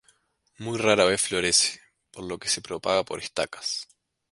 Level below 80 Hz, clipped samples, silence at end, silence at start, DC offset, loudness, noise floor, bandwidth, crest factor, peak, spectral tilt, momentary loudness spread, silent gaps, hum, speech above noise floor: -58 dBFS; under 0.1%; 0.5 s; 0.6 s; under 0.1%; -24 LUFS; -66 dBFS; 11.5 kHz; 24 dB; -4 dBFS; -2 dB/octave; 17 LU; none; none; 40 dB